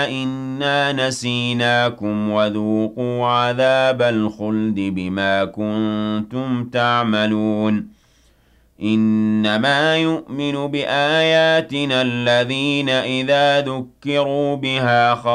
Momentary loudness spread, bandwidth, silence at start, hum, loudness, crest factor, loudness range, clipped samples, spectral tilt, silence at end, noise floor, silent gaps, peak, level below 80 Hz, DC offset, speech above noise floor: 7 LU; 11.5 kHz; 0 s; none; -18 LUFS; 14 dB; 3 LU; under 0.1%; -5.5 dB/octave; 0 s; -55 dBFS; none; -6 dBFS; -58 dBFS; under 0.1%; 37 dB